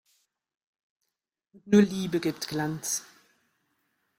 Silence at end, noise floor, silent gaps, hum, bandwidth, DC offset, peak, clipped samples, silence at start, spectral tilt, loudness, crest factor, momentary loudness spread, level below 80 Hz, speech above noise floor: 1.15 s; -85 dBFS; none; none; 16.5 kHz; under 0.1%; -8 dBFS; under 0.1%; 1.65 s; -5 dB/octave; -27 LUFS; 22 dB; 9 LU; -68 dBFS; 59 dB